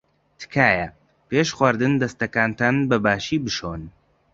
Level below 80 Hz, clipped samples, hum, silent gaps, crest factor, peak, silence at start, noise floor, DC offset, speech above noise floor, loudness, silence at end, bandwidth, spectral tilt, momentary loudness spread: -50 dBFS; under 0.1%; none; none; 20 dB; -2 dBFS; 0.4 s; -45 dBFS; under 0.1%; 24 dB; -21 LUFS; 0.45 s; 7.8 kHz; -5.5 dB/octave; 12 LU